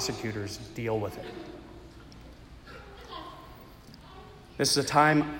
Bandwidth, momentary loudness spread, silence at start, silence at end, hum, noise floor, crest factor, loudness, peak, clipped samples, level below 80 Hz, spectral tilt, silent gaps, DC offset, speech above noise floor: 16.5 kHz; 27 LU; 0 s; 0 s; none; -50 dBFS; 22 dB; -28 LUFS; -8 dBFS; under 0.1%; -54 dBFS; -4 dB/octave; none; under 0.1%; 22 dB